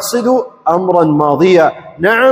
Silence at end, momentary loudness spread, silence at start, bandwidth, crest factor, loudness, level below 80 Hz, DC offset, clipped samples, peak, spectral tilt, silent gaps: 0 s; 6 LU; 0 s; 16 kHz; 10 dB; -11 LUFS; -52 dBFS; under 0.1%; 0.2%; 0 dBFS; -5.5 dB/octave; none